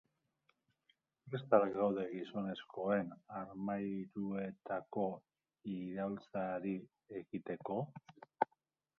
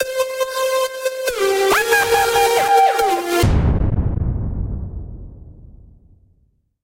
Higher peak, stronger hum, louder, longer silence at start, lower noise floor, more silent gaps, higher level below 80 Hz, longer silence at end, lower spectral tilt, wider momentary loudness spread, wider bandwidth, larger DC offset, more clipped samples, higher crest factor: second, -14 dBFS vs -2 dBFS; neither; second, -40 LUFS vs -17 LUFS; first, 1.25 s vs 0 s; first, -83 dBFS vs -61 dBFS; neither; second, -78 dBFS vs -28 dBFS; second, 0.55 s vs 1.2 s; first, -6.5 dB/octave vs -4.5 dB/octave; about the same, 13 LU vs 13 LU; second, 6 kHz vs 16 kHz; neither; neither; first, 26 dB vs 16 dB